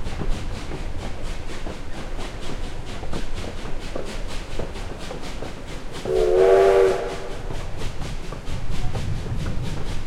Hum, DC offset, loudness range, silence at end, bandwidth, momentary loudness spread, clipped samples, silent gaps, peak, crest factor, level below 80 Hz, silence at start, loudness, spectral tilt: none; under 0.1%; 12 LU; 0 s; 12 kHz; 17 LU; under 0.1%; none; -4 dBFS; 18 dB; -30 dBFS; 0 s; -26 LUFS; -6 dB/octave